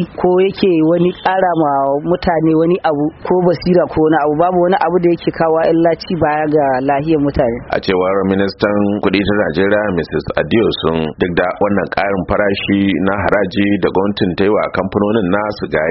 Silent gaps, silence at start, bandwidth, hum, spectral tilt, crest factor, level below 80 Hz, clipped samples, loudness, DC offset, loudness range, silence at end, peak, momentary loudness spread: none; 0 s; 5.8 kHz; none; -5 dB/octave; 14 dB; -38 dBFS; under 0.1%; -14 LUFS; under 0.1%; 2 LU; 0 s; 0 dBFS; 4 LU